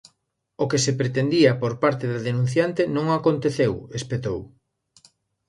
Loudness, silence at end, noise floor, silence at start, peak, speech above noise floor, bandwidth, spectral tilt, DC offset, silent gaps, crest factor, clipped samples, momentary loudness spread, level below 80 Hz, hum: -23 LUFS; 1 s; -73 dBFS; 0.6 s; -4 dBFS; 51 dB; 11.5 kHz; -5.5 dB/octave; under 0.1%; none; 20 dB; under 0.1%; 10 LU; -54 dBFS; none